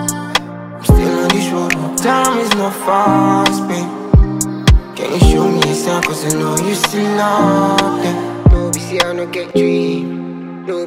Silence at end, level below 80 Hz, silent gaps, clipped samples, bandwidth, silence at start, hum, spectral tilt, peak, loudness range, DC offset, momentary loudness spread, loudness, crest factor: 0 s; -20 dBFS; none; under 0.1%; 16.5 kHz; 0 s; none; -5 dB/octave; 0 dBFS; 1 LU; under 0.1%; 8 LU; -14 LUFS; 14 dB